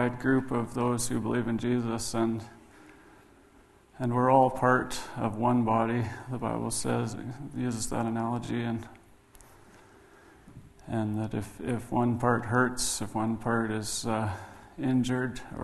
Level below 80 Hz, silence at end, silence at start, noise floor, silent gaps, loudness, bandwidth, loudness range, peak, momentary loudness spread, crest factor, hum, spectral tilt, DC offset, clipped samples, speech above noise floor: -54 dBFS; 0 s; 0 s; -58 dBFS; none; -29 LUFS; 12.5 kHz; 8 LU; -8 dBFS; 10 LU; 22 dB; none; -5.5 dB/octave; under 0.1%; under 0.1%; 30 dB